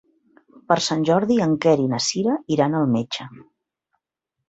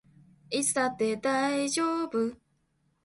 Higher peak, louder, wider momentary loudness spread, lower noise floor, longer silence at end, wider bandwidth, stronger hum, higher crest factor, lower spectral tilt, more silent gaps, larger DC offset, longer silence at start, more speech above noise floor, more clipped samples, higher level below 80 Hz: first, -2 dBFS vs -14 dBFS; first, -20 LUFS vs -29 LUFS; about the same, 7 LU vs 5 LU; first, -82 dBFS vs -72 dBFS; first, 1.1 s vs 0.7 s; second, 8.2 kHz vs 12 kHz; neither; about the same, 20 dB vs 16 dB; first, -5 dB/octave vs -2.5 dB/octave; neither; neither; first, 0.7 s vs 0.5 s; first, 62 dB vs 44 dB; neither; first, -62 dBFS vs -70 dBFS